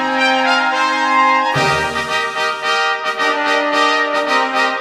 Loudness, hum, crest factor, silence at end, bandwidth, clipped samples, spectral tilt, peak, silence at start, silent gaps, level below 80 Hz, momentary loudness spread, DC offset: -15 LUFS; none; 14 dB; 0 s; 16 kHz; under 0.1%; -3 dB/octave; -2 dBFS; 0 s; none; -50 dBFS; 4 LU; under 0.1%